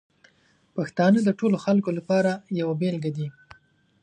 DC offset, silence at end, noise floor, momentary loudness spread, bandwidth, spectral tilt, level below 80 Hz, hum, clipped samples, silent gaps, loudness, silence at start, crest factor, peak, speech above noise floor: under 0.1%; 0.7 s; -63 dBFS; 12 LU; 9.6 kHz; -7.5 dB/octave; -68 dBFS; none; under 0.1%; none; -24 LUFS; 0.75 s; 18 dB; -8 dBFS; 40 dB